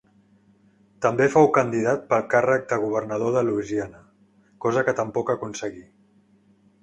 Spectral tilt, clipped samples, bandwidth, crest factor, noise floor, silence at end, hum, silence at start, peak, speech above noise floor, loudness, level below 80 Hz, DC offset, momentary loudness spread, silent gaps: -6.5 dB/octave; under 0.1%; 10.5 kHz; 20 dB; -59 dBFS; 1 s; none; 1 s; -4 dBFS; 37 dB; -23 LUFS; -60 dBFS; under 0.1%; 11 LU; none